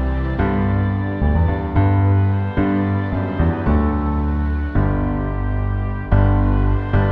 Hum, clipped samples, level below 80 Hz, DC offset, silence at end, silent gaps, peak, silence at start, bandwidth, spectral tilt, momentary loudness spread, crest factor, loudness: none; under 0.1%; -22 dBFS; under 0.1%; 0 s; none; -2 dBFS; 0 s; 4.2 kHz; -11 dB/octave; 6 LU; 14 dB; -19 LUFS